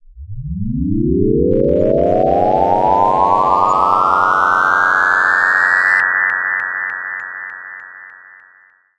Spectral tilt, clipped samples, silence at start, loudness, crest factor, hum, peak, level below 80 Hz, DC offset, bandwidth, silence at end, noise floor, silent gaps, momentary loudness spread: -7 dB/octave; under 0.1%; 0.15 s; -13 LUFS; 14 dB; none; 0 dBFS; -34 dBFS; under 0.1%; 11 kHz; 0.85 s; -50 dBFS; none; 15 LU